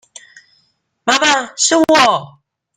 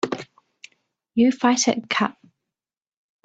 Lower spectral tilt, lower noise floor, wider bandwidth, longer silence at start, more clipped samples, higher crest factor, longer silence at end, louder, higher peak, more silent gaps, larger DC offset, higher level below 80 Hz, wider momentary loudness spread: second, -1.5 dB/octave vs -3 dB/octave; second, -62 dBFS vs under -90 dBFS; first, 15.5 kHz vs 8.6 kHz; first, 1.05 s vs 0.05 s; neither; about the same, 16 dB vs 18 dB; second, 0.5 s vs 1.15 s; first, -13 LUFS vs -21 LUFS; first, 0 dBFS vs -6 dBFS; neither; neither; first, -60 dBFS vs -68 dBFS; about the same, 9 LU vs 10 LU